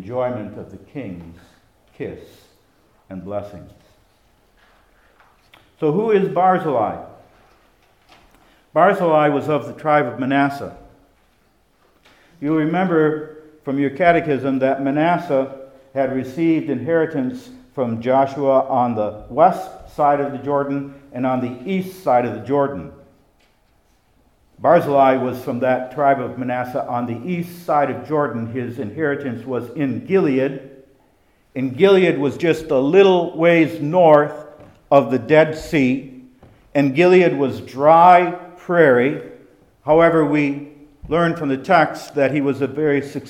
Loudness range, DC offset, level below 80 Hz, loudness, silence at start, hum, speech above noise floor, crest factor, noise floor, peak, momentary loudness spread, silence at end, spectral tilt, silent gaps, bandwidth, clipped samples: 8 LU; under 0.1%; -54 dBFS; -18 LUFS; 0 s; none; 42 dB; 18 dB; -59 dBFS; 0 dBFS; 17 LU; 0 s; -7.5 dB/octave; none; 15.5 kHz; under 0.1%